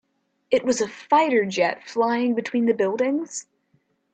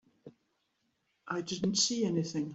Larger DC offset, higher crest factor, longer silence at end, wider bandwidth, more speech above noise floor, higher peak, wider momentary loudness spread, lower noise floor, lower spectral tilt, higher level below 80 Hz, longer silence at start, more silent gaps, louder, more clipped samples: neither; about the same, 16 dB vs 20 dB; first, 0.7 s vs 0 s; about the same, 9 kHz vs 8.2 kHz; about the same, 45 dB vs 46 dB; first, -6 dBFS vs -16 dBFS; second, 6 LU vs 10 LU; second, -67 dBFS vs -79 dBFS; about the same, -4 dB/octave vs -3.5 dB/octave; about the same, -70 dBFS vs -72 dBFS; first, 0.5 s vs 0.25 s; neither; first, -22 LUFS vs -32 LUFS; neither